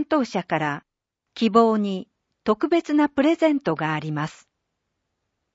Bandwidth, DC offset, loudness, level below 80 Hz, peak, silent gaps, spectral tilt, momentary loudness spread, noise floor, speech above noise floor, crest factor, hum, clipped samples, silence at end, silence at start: 8 kHz; under 0.1%; -22 LUFS; -64 dBFS; -4 dBFS; none; -6.5 dB/octave; 12 LU; -78 dBFS; 57 dB; 20 dB; none; under 0.1%; 1.25 s; 0 s